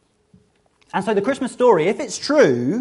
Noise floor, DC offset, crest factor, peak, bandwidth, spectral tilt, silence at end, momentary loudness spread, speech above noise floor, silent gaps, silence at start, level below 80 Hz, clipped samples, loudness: -60 dBFS; under 0.1%; 18 dB; -2 dBFS; 11.5 kHz; -5 dB/octave; 0 s; 9 LU; 42 dB; none; 0.95 s; -62 dBFS; under 0.1%; -18 LUFS